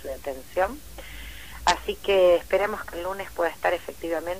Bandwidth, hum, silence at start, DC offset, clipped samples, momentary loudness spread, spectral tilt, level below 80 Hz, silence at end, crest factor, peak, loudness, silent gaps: 15.5 kHz; none; 0 s; 0.5%; under 0.1%; 20 LU; -3.5 dB/octave; -46 dBFS; 0 s; 20 dB; -6 dBFS; -25 LUFS; none